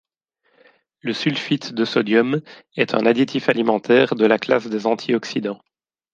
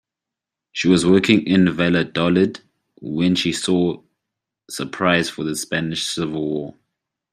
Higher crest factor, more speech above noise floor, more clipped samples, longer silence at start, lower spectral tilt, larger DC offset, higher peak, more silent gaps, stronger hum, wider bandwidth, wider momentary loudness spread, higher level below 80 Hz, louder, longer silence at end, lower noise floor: about the same, 18 dB vs 18 dB; second, 49 dB vs 67 dB; neither; first, 1.05 s vs 0.75 s; about the same, -6 dB/octave vs -5 dB/octave; neither; about the same, -2 dBFS vs -2 dBFS; neither; neither; second, 7.6 kHz vs 14.5 kHz; second, 10 LU vs 15 LU; second, -66 dBFS vs -56 dBFS; about the same, -19 LUFS vs -19 LUFS; about the same, 0.6 s vs 0.65 s; second, -68 dBFS vs -86 dBFS